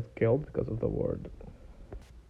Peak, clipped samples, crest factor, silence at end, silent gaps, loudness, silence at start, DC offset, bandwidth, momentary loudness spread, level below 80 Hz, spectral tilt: -14 dBFS; under 0.1%; 20 dB; 0.05 s; none; -32 LUFS; 0 s; under 0.1%; 6 kHz; 21 LU; -48 dBFS; -10 dB/octave